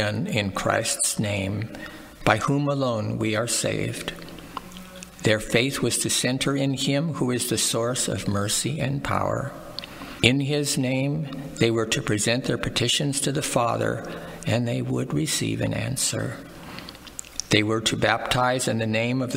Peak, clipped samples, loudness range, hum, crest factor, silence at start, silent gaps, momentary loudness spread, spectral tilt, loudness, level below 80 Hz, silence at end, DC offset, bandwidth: 0 dBFS; under 0.1%; 3 LU; none; 24 dB; 0 s; none; 14 LU; -4 dB/octave; -24 LUFS; -50 dBFS; 0 s; under 0.1%; 16 kHz